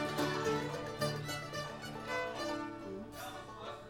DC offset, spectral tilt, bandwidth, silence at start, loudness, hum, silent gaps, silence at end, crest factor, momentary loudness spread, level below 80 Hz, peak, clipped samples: under 0.1%; -4.5 dB/octave; 18 kHz; 0 s; -39 LUFS; none; none; 0 s; 18 dB; 10 LU; -64 dBFS; -22 dBFS; under 0.1%